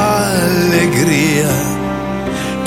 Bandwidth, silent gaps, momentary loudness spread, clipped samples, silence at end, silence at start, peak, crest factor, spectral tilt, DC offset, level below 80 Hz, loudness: 16.5 kHz; none; 7 LU; under 0.1%; 0 s; 0 s; 0 dBFS; 14 dB; -5 dB/octave; under 0.1%; -36 dBFS; -14 LUFS